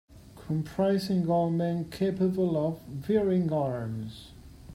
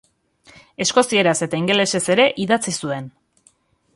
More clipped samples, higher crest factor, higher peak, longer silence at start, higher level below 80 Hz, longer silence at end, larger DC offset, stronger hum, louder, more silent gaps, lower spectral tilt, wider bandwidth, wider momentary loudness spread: neither; about the same, 16 dB vs 18 dB; second, -14 dBFS vs -2 dBFS; second, 0.1 s vs 0.8 s; first, -56 dBFS vs -62 dBFS; second, 0 s vs 0.85 s; neither; neither; second, -29 LUFS vs -18 LUFS; neither; first, -8.5 dB/octave vs -3.5 dB/octave; first, 15 kHz vs 11.5 kHz; about the same, 12 LU vs 12 LU